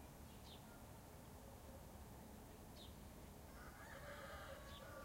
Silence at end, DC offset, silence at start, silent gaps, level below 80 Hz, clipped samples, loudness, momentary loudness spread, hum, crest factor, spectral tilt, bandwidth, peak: 0 s; under 0.1%; 0 s; none; -64 dBFS; under 0.1%; -58 LUFS; 5 LU; none; 14 dB; -4.5 dB/octave; 16 kHz; -44 dBFS